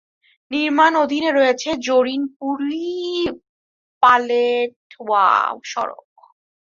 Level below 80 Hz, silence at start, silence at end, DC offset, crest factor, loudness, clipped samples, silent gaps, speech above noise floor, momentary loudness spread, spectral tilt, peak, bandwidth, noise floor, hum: -60 dBFS; 0.5 s; 0.7 s; under 0.1%; 18 dB; -18 LUFS; under 0.1%; 2.36-2.40 s, 3.49-4.01 s, 4.76-4.90 s; over 72 dB; 11 LU; -3 dB/octave; -2 dBFS; 7.6 kHz; under -90 dBFS; none